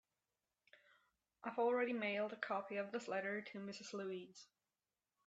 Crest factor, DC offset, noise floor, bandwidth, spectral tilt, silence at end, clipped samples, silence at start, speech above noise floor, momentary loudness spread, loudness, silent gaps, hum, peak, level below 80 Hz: 20 dB; under 0.1%; under -90 dBFS; 8 kHz; -4.5 dB/octave; 0.8 s; under 0.1%; 1.45 s; over 47 dB; 13 LU; -43 LUFS; none; none; -24 dBFS; under -90 dBFS